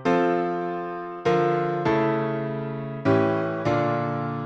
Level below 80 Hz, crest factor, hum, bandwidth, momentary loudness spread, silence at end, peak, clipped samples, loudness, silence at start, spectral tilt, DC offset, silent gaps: -58 dBFS; 16 dB; none; 7.8 kHz; 8 LU; 0 s; -8 dBFS; under 0.1%; -24 LUFS; 0 s; -8 dB/octave; under 0.1%; none